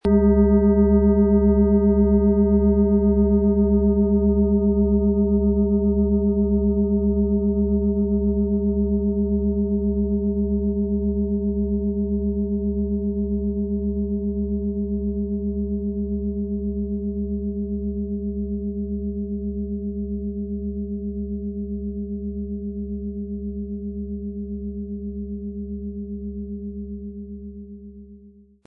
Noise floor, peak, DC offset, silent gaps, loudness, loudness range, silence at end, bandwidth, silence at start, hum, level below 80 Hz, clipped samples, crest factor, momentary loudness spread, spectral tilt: -49 dBFS; -6 dBFS; under 0.1%; none; -22 LUFS; 13 LU; 0.35 s; 2.1 kHz; 0.05 s; none; -30 dBFS; under 0.1%; 16 dB; 14 LU; -14 dB/octave